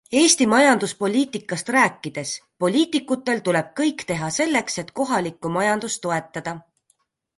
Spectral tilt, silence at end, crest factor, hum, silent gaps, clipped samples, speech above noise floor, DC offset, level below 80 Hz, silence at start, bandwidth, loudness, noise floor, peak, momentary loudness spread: -3.5 dB/octave; 0.8 s; 18 dB; none; none; under 0.1%; 46 dB; under 0.1%; -64 dBFS; 0.1 s; 11.5 kHz; -21 LUFS; -67 dBFS; -4 dBFS; 13 LU